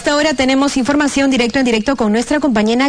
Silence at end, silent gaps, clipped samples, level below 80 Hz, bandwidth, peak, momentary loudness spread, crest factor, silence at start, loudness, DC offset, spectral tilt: 0 s; none; under 0.1%; -40 dBFS; 10.5 kHz; -2 dBFS; 2 LU; 10 dB; 0 s; -14 LUFS; 0.4%; -4 dB/octave